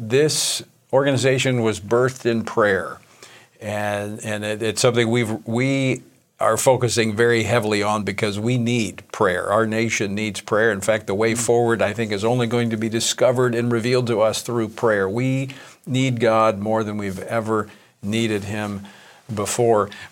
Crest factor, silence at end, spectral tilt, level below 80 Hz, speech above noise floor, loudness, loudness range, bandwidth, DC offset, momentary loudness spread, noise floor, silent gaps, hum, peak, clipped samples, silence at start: 18 dB; 0.05 s; -4.5 dB/octave; -64 dBFS; 27 dB; -20 LUFS; 3 LU; 17 kHz; under 0.1%; 9 LU; -47 dBFS; none; none; -2 dBFS; under 0.1%; 0 s